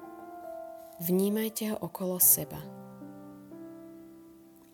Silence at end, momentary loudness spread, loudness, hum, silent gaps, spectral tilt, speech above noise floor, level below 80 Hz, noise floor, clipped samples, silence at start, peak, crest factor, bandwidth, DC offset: 0.35 s; 26 LU; -27 LUFS; none; none; -4 dB/octave; 26 dB; -70 dBFS; -55 dBFS; under 0.1%; 0 s; -8 dBFS; 24 dB; 19 kHz; under 0.1%